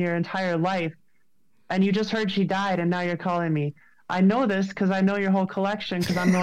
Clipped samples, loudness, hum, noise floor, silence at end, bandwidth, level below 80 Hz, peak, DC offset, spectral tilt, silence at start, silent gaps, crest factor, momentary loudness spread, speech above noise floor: under 0.1%; -25 LUFS; none; -72 dBFS; 0 s; 13 kHz; -62 dBFS; -10 dBFS; 0.2%; -6.5 dB/octave; 0 s; none; 14 dB; 6 LU; 49 dB